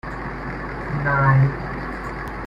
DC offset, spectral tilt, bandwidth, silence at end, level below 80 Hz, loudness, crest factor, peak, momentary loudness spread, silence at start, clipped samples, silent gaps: under 0.1%; -9 dB/octave; 5.6 kHz; 0 s; -36 dBFS; -22 LUFS; 18 dB; -4 dBFS; 13 LU; 0.05 s; under 0.1%; none